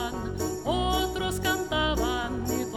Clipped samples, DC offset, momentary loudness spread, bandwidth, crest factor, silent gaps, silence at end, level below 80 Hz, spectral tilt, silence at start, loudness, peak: under 0.1%; under 0.1%; 5 LU; 20 kHz; 14 dB; none; 0 s; -38 dBFS; -4 dB/octave; 0 s; -28 LUFS; -14 dBFS